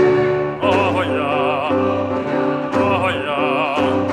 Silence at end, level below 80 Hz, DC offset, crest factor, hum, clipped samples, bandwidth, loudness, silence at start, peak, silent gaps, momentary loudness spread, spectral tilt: 0 s; -52 dBFS; under 0.1%; 14 dB; none; under 0.1%; 10 kHz; -18 LUFS; 0 s; -2 dBFS; none; 3 LU; -6.5 dB/octave